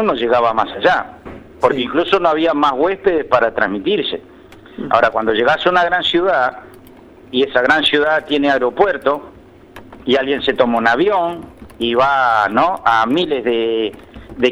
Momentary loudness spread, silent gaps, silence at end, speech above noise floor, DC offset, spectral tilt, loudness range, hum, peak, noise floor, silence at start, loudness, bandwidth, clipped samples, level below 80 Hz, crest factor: 9 LU; none; 0 s; 26 dB; under 0.1%; -5 dB/octave; 2 LU; none; 0 dBFS; -41 dBFS; 0 s; -15 LUFS; 13.5 kHz; under 0.1%; -48 dBFS; 16 dB